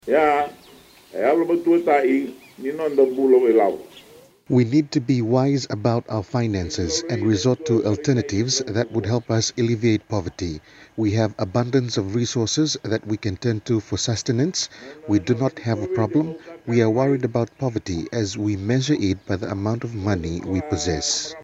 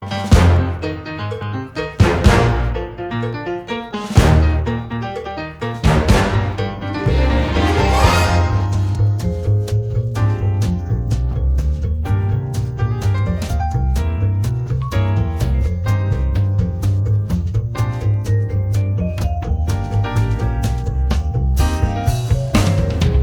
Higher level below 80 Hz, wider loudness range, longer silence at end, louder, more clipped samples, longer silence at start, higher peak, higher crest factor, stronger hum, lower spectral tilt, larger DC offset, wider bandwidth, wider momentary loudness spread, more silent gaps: second, -54 dBFS vs -22 dBFS; about the same, 4 LU vs 3 LU; about the same, 0 s vs 0 s; second, -22 LUFS vs -18 LUFS; neither; about the same, 0.05 s vs 0 s; second, -4 dBFS vs 0 dBFS; about the same, 18 dB vs 16 dB; neither; about the same, -5.5 dB/octave vs -6.5 dB/octave; neither; second, 8.4 kHz vs 15.5 kHz; about the same, 8 LU vs 10 LU; neither